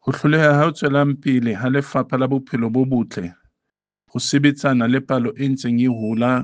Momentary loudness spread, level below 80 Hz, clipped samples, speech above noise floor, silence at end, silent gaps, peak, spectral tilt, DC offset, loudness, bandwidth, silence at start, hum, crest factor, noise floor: 7 LU; -60 dBFS; under 0.1%; 64 dB; 0 s; none; -2 dBFS; -6.5 dB/octave; under 0.1%; -19 LUFS; 9.6 kHz; 0.05 s; none; 16 dB; -82 dBFS